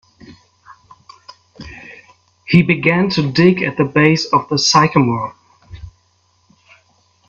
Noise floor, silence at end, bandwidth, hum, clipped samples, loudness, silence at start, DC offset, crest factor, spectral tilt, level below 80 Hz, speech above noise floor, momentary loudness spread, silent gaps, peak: -59 dBFS; 1.4 s; 7.6 kHz; none; under 0.1%; -14 LUFS; 0.3 s; under 0.1%; 18 dB; -5 dB/octave; -48 dBFS; 45 dB; 20 LU; none; 0 dBFS